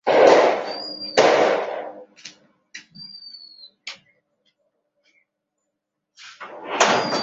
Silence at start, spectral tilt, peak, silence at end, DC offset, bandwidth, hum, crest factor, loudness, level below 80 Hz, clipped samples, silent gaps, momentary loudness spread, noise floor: 0.05 s; -2.5 dB/octave; -2 dBFS; 0 s; under 0.1%; 8 kHz; none; 22 dB; -18 LUFS; -72 dBFS; under 0.1%; none; 27 LU; -80 dBFS